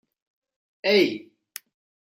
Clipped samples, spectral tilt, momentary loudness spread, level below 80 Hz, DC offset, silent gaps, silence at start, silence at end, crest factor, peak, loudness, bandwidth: under 0.1%; -4 dB/octave; 22 LU; -80 dBFS; under 0.1%; none; 0.85 s; 0.95 s; 20 dB; -8 dBFS; -22 LUFS; 16 kHz